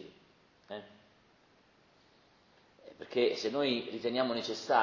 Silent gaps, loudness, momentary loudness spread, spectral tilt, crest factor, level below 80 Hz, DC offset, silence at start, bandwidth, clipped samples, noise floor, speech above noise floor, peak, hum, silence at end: none; -33 LUFS; 19 LU; -4 dB/octave; 22 dB; -78 dBFS; under 0.1%; 0 s; 7.6 kHz; under 0.1%; -66 dBFS; 34 dB; -14 dBFS; none; 0 s